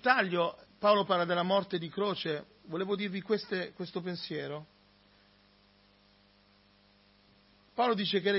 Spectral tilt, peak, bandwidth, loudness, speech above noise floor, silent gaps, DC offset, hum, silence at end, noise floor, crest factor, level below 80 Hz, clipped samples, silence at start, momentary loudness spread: -8.5 dB/octave; -10 dBFS; 5.8 kHz; -32 LUFS; 34 dB; none; under 0.1%; 50 Hz at -60 dBFS; 0 s; -64 dBFS; 22 dB; -76 dBFS; under 0.1%; 0.05 s; 12 LU